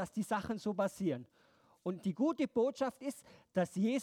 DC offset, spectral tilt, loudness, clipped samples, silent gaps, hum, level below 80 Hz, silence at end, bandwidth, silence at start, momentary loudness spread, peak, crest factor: under 0.1%; -6.5 dB/octave; -37 LUFS; under 0.1%; none; none; -72 dBFS; 0 s; 16 kHz; 0 s; 11 LU; -20 dBFS; 16 dB